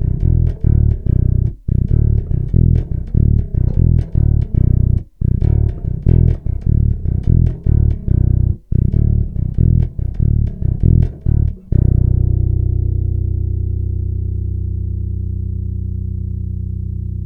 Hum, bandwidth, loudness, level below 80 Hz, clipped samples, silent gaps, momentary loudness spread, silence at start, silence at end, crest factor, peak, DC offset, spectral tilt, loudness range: 60 Hz at -35 dBFS; 2.3 kHz; -17 LUFS; -18 dBFS; under 0.1%; none; 8 LU; 0 s; 0 s; 14 dB; 0 dBFS; under 0.1%; -13 dB/octave; 5 LU